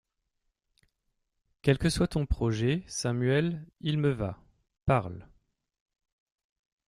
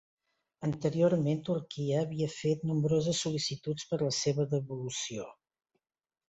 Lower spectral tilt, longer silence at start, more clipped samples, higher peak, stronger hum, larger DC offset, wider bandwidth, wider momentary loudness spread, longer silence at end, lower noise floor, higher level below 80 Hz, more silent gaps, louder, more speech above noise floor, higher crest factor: about the same, -6 dB/octave vs -5.5 dB/octave; first, 1.65 s vs 0.6 s; neither; first, -10 dBFS vs -16 dBFS; neither; neither; first, 13.5 kHz vs 8.2 kHz; about the same, 9 LU vs 9 LU; first, 1.65 s vs 0.95 s; about the same, -80 dBFS vs -83 dBFS; first, -46 dBFS vs -66 dBFS; neither; first, -29 LUFS vs -32 LUFS; about the same, 52 dB vs 52 dB; about the same, 22 dB vs 18 dB